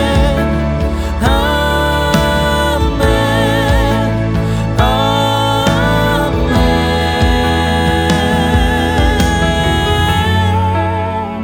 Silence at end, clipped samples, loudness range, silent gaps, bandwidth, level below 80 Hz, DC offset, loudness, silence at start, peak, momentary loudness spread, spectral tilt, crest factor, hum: 0 s; under 0.1%; 1 LU; none; 18.5 kHz; -20 dBFS; under 0.1%; -13 LUFS; 0 s; -2 dBFS; 3 LU; -5.5 dB/octave; 10 dB; none